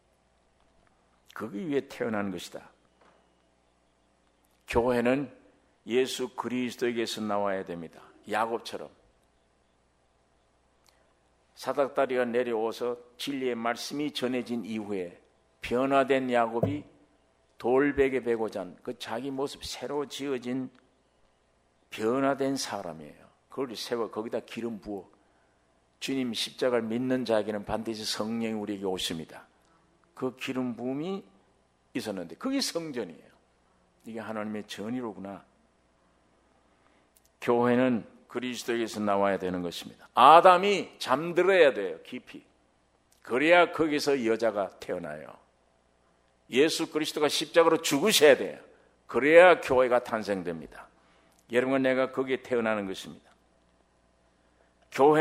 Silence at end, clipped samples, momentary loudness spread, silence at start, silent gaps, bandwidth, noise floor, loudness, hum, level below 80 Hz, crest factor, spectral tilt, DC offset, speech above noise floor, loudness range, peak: 0 s; under 0.1%; 18 LU; 1.35 s; none; 16 kHz; -68 dBFS; -27 LUFS; none; -62 dBFS; 26 dB; -4 dB/octave; under 0.1%; 41 dB; 14 LU; -4 dBFS